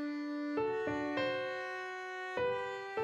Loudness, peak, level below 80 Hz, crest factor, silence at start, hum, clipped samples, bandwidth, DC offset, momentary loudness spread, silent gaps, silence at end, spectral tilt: -37 LUFS; -22 dBFS; -72 dBFS; 16 dB; 0 s; none; under 0.1%; 9.8 kHz; under 0.1%; 6 LU; none; 0 s; -5.5 dB/octave